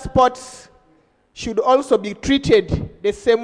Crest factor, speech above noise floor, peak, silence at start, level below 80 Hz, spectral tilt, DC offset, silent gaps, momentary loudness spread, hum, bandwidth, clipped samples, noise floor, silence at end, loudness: 18 dB; 40 dB; -2 dBFS; 0 s; -38 dBFS; -5.5 dB/octave; under 0.1%; none; 13 LU; none; 10.5 kHz; under 0.1%; -57 dBFS; 0 s; -18 LUFS